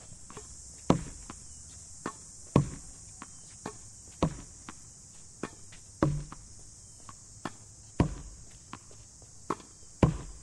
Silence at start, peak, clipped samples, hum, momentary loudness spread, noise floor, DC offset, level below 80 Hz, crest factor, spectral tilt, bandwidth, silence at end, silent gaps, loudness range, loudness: 0 s; -8 dBFS; under 0.1%; none; 20 LU; -52 dBFS; under 0.1%; -48 dBFS; 28 dB; -6 dB/octave; 12 kHz; 0 s; none; 5 LU; -35 LUFS